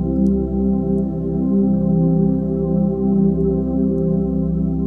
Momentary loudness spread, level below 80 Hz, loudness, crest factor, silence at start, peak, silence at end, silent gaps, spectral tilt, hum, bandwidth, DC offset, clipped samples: 4 LU; -30 dBFS; -18 LUFS; 12 dB; 0 s; -6 dBFS; 0 s; none; -13.5 dB/octave; none; 1.6 kHz; under 0.1%; under 0.1%